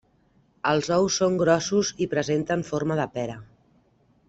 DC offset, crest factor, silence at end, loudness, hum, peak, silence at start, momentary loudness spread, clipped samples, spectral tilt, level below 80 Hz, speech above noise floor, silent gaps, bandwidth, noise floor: under 0.1%; 18 dB; 0.85 s; -24 LUFS; none; -6 dBFS; 0.65 s; 9 LU; under 0.1%; -4.5 dB/octave; -58 dBFS; 39 dB; none; 8.2 kHz; -63 dBFS